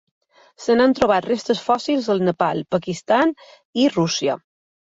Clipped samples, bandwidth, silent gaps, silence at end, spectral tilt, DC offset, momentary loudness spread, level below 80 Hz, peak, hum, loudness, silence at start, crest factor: under 0.1%; 8 kHz; 3.65-3.73 s; 0.5 s; -5 dB/octave; under 0.1%; 8 LU; -56 dBFS; -4 dBFS; none; -20 LUFS; 0.6 s; 16 dB